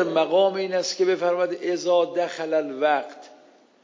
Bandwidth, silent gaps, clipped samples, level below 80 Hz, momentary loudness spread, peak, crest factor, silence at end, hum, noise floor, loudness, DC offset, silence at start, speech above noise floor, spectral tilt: 7.6 kHz; none; under 0.1%; -90 dBFS; 6 LU; -8 dBFS; 14 dB; 0.55 s; none; -54 dBFS; -23 LUFS; under 0.1%; 0 s; 31 dB; -4 dB/octave